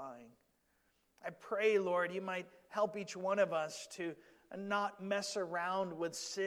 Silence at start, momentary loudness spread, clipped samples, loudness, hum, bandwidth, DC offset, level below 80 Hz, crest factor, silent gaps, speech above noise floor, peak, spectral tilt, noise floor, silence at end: 0 s; 16 LU; under 0.1%; -38 LUFS; none; 19 kHz; under 0.1%; -86 dBFS; 20 dB; none; 39 dB; -20 dBFS; -3.5 dB/octave; -77 dBFS; 0 s